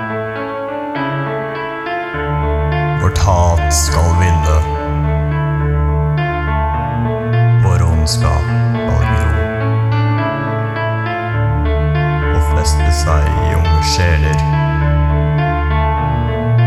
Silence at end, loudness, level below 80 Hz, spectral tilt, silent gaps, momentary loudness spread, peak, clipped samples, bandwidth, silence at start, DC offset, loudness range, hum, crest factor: 0 s; -15 LUFS; -20 dBFS; -6 dB/octave; none; 7 LU; -2 dBFS; under 0.1%; 13.5 kHz; 0 s; under 0.1%; 2 LU; none; 12 dB